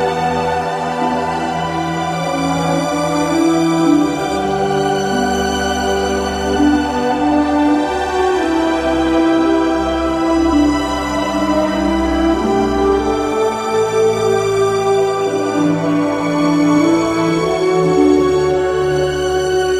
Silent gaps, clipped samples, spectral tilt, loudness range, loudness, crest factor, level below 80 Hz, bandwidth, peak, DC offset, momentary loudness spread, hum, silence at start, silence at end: none; under 0.1%; -5.5 dB/octave; 2 LU; -15 LUFS; 14 dB; -34 dBFS; 14.5 kHz; -2 dBFS; under 0.1%; 5 LU; none; 0 s; 0 s